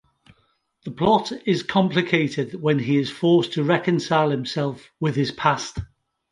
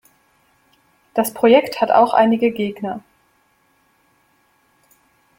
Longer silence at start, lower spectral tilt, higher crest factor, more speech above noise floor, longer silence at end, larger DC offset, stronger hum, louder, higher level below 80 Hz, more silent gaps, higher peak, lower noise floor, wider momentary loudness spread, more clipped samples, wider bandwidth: second, 0.85 s vs 1.15 s; about the same, -6 dB/octave vs -5 dB/octave; about the same, 20 dB vs 18 dB; about the same, 45 dB vs 45 dB; second, 0.45 s vs 2.4 s; neither; neither; second, -22 LUFS vs -17 LUFS; first, -50 dBFS vs -62 dBFS; neither; about the same, -2 dBFS vs -2 dBFS; first, -66 dBFS vs -61 dBFS; second, 9 LU vs 14 LU; neither; second, 11.5 kHz vs 16.5 kHz